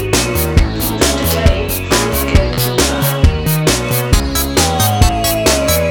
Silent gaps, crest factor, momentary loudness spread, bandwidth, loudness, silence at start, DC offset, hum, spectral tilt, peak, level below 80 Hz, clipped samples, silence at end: none; 12 dB; 2 LU; over 20 kHz; -13 LUFS; 0 s; 0.3%; none; -4 dB/octave; 0 dBFS; -18 dBFS; under 0.1%; 0 s